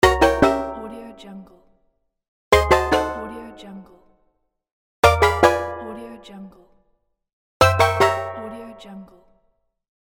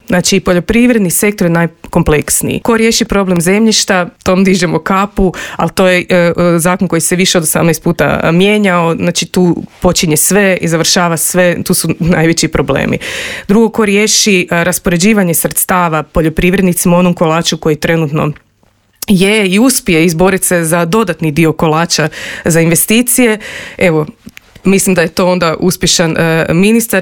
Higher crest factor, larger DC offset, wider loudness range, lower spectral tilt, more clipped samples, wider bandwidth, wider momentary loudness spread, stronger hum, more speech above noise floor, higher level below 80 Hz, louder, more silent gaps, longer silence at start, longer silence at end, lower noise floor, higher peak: first, 22 dB vs 10 dB; second, under 0.1% vs 0.5%; about the same, 3 LU vs 1 LU; about the same, -5 dB/octave vs -4 dB/octave; neither; about the same, over 20 kHz vs 20 kHz; first, 24 LU vs 5 LU; neither; second, 28 dB vs 42 dB; about the same, -36 dBFS vs -32 dBFS; second, -18 LUFS vs -10 LUFS; first, 2.28-2.51 s, 4.72-5.03 s, 7.33-7.60 s vs none; about the same, 0 s vs 0.1 s; first, 1 s vs 0 s; first, -68 dBFS vs -52 dBFS; about the same, 0 dBFS vs 0 dBFS